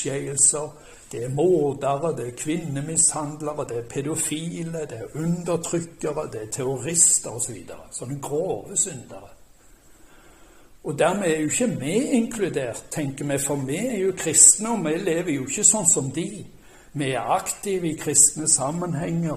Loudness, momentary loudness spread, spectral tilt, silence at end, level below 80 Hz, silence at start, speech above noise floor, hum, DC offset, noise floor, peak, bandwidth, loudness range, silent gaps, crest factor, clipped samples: -21 LUFS; 15 LU; -3.5 dB/octave; 0 s; -54 dBFS; 0 s; 27 dB; none; under 0.1%; -51 dBFS; 0 dBFS; 15.5 kHz; 9 LU; none; 24 dB; under 0.1%